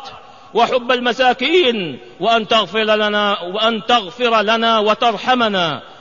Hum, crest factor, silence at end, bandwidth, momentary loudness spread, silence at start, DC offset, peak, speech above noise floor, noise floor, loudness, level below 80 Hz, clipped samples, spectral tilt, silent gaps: none; 14 dB; 0.05 s; 7.4 kHz; 6 LU; 0 s; 0.4%; -2 dBFS; 21 dB; -37 dBFS; -15 LUFS; -56 dBFS; under 0.1%; -4 dB/octave; none